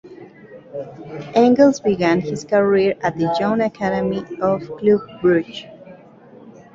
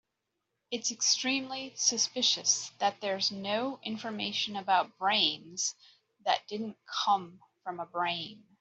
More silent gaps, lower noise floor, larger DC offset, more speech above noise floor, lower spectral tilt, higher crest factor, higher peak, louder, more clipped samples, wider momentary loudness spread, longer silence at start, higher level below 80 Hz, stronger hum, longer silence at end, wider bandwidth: neither; second, -44 dBFS vs -84 dBFS; neither; second, 26 dB vs 52 dB; first, -6.5 dB/octave vs -1 dB/octave; about the same, 18 dB vs 22 dB; first, -2 dBFS vs -10 dBFS; first, -18 LUFS vs -30 LUFS; neither; first, 18 LU vs 12 LU; second, 0.05 s vs 0.7 s; first, -54 dBFS vs -82 dBFS; neither; about the same, 0.25 s vs 0.25 s; about the same, 7.8 kHz vs 8.2 kHz